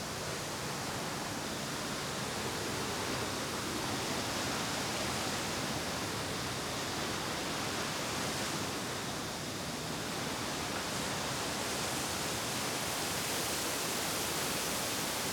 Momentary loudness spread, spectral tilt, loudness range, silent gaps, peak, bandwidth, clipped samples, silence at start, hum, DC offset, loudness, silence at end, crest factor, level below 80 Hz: 4 LU; -2.5 dB/octave; 3 LU; none; -22 dBFS; 19 kHz; under 0.1%; 0 s; none; under 0.1%; -35 LUFS; 0 s; 14 dB; -58 dBFS